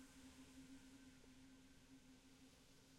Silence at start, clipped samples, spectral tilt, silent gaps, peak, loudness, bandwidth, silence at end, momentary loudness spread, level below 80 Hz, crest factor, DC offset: 0 s; under 0.1%; -3.5 dB/octave; none; -52 dBFS; -65 LUFS; 16 kHz; 0 s; 5 LU; -76 dBFS; 14 dB; under 0.1%